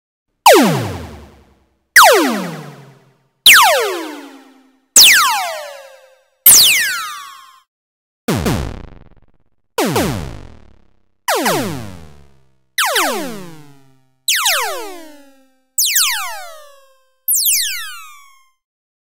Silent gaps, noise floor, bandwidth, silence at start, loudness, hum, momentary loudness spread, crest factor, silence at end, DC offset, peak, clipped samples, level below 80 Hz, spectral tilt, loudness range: 7.68-8.28 s; -58 dBFS; 16.5 kHz; 0.45 s; -11 LUFS; none; 24 LU; 16 dB; 0.95 s; under 0.1%; 0 dBFS; 0.1%; -42 dBFS; -1.5 dB/octave; 12 LU